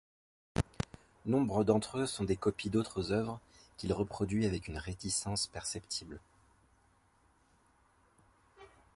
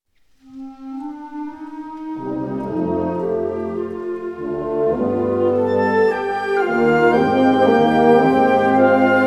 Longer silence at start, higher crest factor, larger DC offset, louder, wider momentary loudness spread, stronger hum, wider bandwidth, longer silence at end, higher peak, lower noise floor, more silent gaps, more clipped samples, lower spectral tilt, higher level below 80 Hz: about the same, 0.55 s vs 0.5 s; first, 24 dB vs 16 dB; neither; second, -35 LUFS vs -17 LUFS; second, 12 LU vs 17 LU; neither; about the same, 11.5 kHz vs 11.5 kHz; first, 0.3 s vs 0 s; second, -12 dBFS vs -2 dBFS; first, -70 dBFS vs -52 dBFS; neither; neither; second, -5 dB/octave vs -7.5 dB/octave; about the same, -54 dBFS vs -52 dBFS